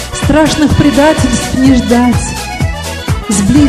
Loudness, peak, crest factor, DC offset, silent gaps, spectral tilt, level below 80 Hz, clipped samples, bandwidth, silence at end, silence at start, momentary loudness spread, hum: -10 LUFS; 0 dBFS; 10 dB; under 0.1%; none; -5 dB/octave; -22 dBFS; 0.6%; 15 kHz; 0 s; 0 s; 9 LU; none